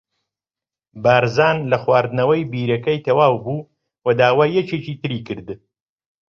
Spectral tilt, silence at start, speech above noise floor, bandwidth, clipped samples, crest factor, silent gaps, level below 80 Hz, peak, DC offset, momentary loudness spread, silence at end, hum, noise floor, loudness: -7 dB/octave; 0.95 s; over 73 dB; 7 kHz; under 0.1%; 18 dB; none; -56 dBFS; -2 dBFS; under 0.1%; 13 LU; 0.75 s; none; under -90 dBFS; -18 LUFS